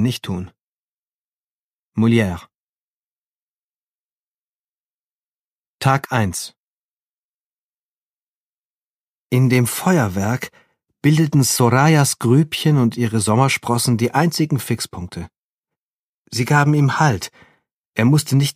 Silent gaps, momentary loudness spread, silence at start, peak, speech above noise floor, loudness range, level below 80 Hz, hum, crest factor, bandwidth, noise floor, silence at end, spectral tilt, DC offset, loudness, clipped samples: 0.61-1.92 s, 2.55-5.79 s, 6.57-9.30 s, 15.38-15.64 s, 15.78-16.25 s, 17.72-17.93 s; 14 LU; 0 s; 0 dBFS; over 73 dB; 9 LU; -54 dBFS; none; 20 dB; 15.5 kHz; under -90 dBFS; 0.05 s; -5.5 dB/octave; under 0.1%; -17 LUFS; under 0.1%